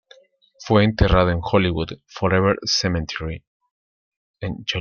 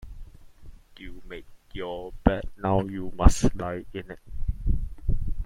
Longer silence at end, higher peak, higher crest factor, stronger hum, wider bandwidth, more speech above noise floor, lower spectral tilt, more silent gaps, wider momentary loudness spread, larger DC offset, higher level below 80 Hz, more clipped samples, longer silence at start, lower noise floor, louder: about the same, 0 s vs 0 s; about the same, -2 dBFS vs -2 dBFS; about the same, 20 dB vs 24 dB; neither; second, 7 kHz vs 11.5 kHz; first, 33 dB vs 21 dB; about the same, -5.5 dB/octave vs -6.5 dB/octave; first, 3.47-3.60 s, 3.71-4.34 s vs none; second, 15 LU vs 21 LU; neither; about the same, -34 dBFS vs -30 dBFS; neither; first, 0.6 s vs 0 s; first, -53 dBFS vs -45 dBFS; first, -20 LUFS vs -28 LUFS